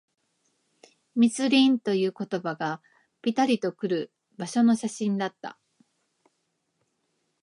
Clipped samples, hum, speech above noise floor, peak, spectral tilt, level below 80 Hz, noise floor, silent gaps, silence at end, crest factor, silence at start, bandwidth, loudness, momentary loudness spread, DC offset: under 0.1%; none; 52 dB; -10 dBFS; -5 dB/octave; -80 dBFS; -76 dBFS; none; 1.9 s; 18 dB; 1.15 s; 11.5 kHz; -26 LUFS; 15 LU; under 0.1%